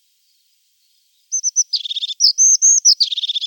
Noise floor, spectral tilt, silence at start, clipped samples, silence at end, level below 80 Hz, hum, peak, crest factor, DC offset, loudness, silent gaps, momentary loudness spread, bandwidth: -61 dBFS; 14.5 dB/octave; 1.3 s; under 0.1%; 0 s; under -90 dBFS; none; -2 dBFS; 14 dB; under 0.1%; -12 LUFS; none; 11 LU; 17.5 kHz